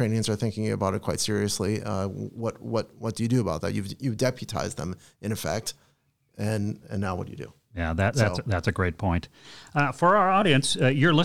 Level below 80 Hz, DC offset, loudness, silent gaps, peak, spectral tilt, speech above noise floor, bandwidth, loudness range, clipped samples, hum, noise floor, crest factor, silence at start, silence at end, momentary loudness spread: -52 dBFS; 0.2%; -26 LUFS; none; -8 dBFS; -5 dB/octave; 42 dB; 16 kHz; 7 LU; under 0.1%; none; -67 dBFS; 18 dB; 0 s; 0 s; 13 LU